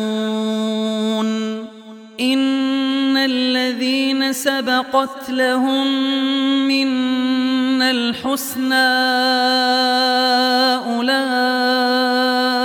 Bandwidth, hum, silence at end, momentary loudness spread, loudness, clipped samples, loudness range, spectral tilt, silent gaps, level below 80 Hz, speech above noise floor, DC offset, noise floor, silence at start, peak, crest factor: 17 kHz; none; 0 s; 6 LU; -17 LUFS; under 0.1%; 3 LU; -3 dB/octave; none; -68 dBFS; 21 dB; under 0.1%; -38 dBFS; 0 s; -2 dBFS; 14 dB